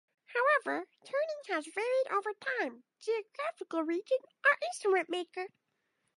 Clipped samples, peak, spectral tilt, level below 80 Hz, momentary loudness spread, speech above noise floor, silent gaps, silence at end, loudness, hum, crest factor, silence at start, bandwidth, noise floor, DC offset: under 0.1%; -16 dBFS; -2 dB/octave; under -90 dBFS; 11 LU; 47 dB; none; 0.7 s; -33 LUFS; none; 18 dB; 0.3 s; 11.5 kHz; -80 dBFS; under 0.1%